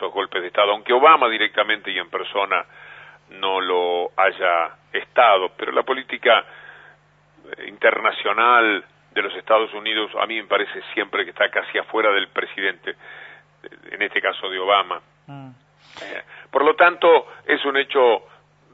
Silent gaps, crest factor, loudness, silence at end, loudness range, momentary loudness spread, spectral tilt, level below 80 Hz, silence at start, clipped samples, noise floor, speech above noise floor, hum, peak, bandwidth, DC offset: none; 20 dB; -19 LUFS; 0.55 s; 4 LU; 18 LU; -5 dB/octave; -72 dBFS; 0 s; under 0.1%; -55 dBFS; 35 dB; 50 Hz at -60 dBFS; 0 dBFS; 6 kHz; under 0.1%